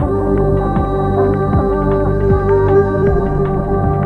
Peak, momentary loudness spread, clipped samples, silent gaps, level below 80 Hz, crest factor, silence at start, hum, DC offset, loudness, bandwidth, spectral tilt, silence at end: -2 dBFS; 4 LU; under 0.1%; none; -22 dBFS; 10 dB; 0 s; none; under 0.1%; -14 LUFS; 4.2 kHz; -10.5 dB/octave; 0 s